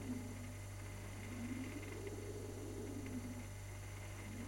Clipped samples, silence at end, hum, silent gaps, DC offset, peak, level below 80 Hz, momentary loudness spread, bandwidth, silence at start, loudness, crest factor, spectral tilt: under 0.1%; 0 s; 50 Hz at -60 dBFS; none; under 0.1%; -34 dBFS; -58 dBFS; 4 LU; 16.5 kHz; 0 s; -48 LUFS; 14 dB; -5.5 dB/octave